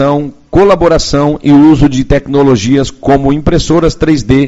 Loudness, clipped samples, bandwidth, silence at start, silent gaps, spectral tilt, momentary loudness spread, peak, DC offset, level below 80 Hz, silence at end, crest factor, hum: -9 LUFS; 3%; 8 kHz; 0 s; none; -6.5 dB/octave; 6 LU; 0 dBFS; under 0.1%; -22 dBFS; 0 s; 8 dB; none